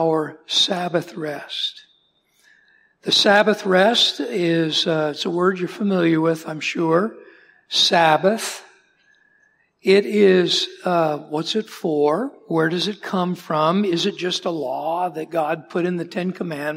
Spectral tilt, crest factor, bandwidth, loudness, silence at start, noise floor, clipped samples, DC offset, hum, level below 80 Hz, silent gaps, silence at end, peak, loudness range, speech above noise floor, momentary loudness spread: -4.5 dB/octave; 18 dB; 16 kHz; -20 LUFS; 0 s; -63 dBFS; under 0.1%; under 0.1%; none; -74 dBFS; none; 0 s; -2 dBFS; 4 LU; 43 dB; 10 LU